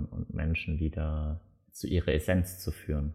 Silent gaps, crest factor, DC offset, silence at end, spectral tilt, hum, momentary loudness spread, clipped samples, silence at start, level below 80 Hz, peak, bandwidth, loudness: none; 16 dB; under 0.1%; 0 s; -6.5 dB/octave; none; 11 LU; under 0.1%; 0 s; -38 dBFS; -14 dBFS; 15 kHz; -32 LUFS